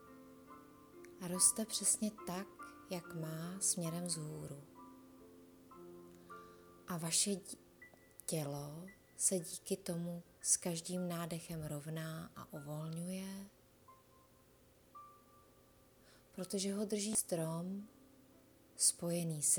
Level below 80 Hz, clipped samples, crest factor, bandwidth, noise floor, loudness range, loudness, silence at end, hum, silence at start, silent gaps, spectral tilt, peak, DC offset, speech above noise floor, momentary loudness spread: -74 dBFS; under 0.1%; 26 dB; over 20 kHz; -67 dBFS; 12 LU; -38 LUFS; 0 s; none; 0 s; none; -3.5 dB/octave; -16 dBFS; under 0.1%; 28 dB; 25 LU